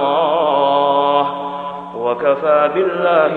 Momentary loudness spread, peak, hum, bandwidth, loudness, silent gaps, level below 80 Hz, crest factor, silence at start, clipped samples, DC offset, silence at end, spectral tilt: 10 LU; 0 dBFS; none; 4.5 kHz; -15 LUFS; none; -58 dBFS; 14 dB; 0 s; under 0.1%; under 0.1%; 0 s; -7 dB/octave